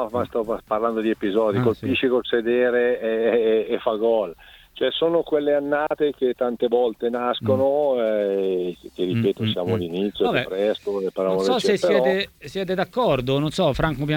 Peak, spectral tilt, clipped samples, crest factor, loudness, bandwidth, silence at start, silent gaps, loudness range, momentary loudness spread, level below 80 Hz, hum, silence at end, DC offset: -6 dBFS; -6.5 dB/octave; under 0.1%; 16 dB; -22 LUFS; 17.5 kHz; 0 s; none; 2 LU; 6 LU; -48 dBFS; none; 0 s; under 0.1%